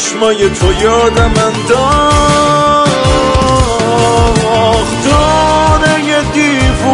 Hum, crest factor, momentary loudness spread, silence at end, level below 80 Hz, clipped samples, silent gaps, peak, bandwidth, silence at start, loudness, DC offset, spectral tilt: none; 8 dB; 3 LU; 0 s; -20 dBFS; under 0.1%; none; 0 dBFS; 11 kHz; 0 s; -9 LUFS; under 0.1%; -4.5 dB/octave